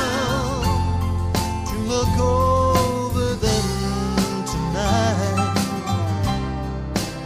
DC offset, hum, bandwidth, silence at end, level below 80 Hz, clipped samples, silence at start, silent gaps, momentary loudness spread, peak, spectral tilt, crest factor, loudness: under 0.1%; none; 15.5 kHz; 0 s; -30 dBFS; under 0.1%; 0 s; none; 7 LU; -6 dBFS; -5.5 dB/octave; 14 dB; -21 LUFS